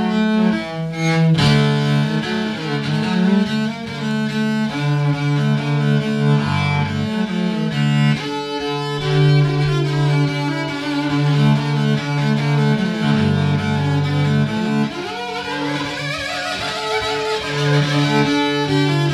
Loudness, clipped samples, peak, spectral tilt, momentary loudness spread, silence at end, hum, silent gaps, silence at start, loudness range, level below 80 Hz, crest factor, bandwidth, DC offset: -18 LUFS; under 0.1%; -6 dBFS; -6.5 dB/octave; 7 LU; 0 s; none; none; 0 s; 3 LU; -48 dBFS; 12 dB; 11.5 kHz; under 0.1%